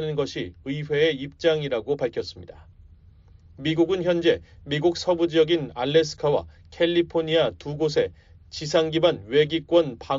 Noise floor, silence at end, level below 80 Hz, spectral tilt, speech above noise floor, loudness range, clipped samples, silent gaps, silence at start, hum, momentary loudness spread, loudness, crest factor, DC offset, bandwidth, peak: -51 dBFS; 0 s; -52 dBFS; -4 dB/octave; 28 dB; 4 LU; under 0.1%; none; 0 s; none; 9 LU; -24 LUFS; 18 dB; under 0.1%; 7.6 kHz; -6 dBFS